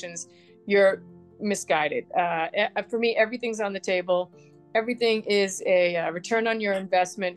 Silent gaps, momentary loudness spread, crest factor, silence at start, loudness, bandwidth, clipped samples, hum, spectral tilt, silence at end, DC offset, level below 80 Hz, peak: none; 9 LU; 18 dB; 0 s; -25 LUFS; 12.5 kHz; under 0.1%; none; -3.5 dB/octave; 0 s; under 0.1%; -78 dBFS; -6 dBFS